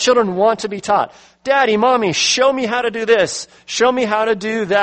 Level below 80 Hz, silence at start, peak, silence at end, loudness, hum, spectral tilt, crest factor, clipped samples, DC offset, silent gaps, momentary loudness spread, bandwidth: -58 dBFS; 0 s; -2 dBFS; 0 s; -16 LUFS; none; -3 dB/octave; 14 dB; under 0.1%; under 0.1%; none; 8 LU; 8.8 kHz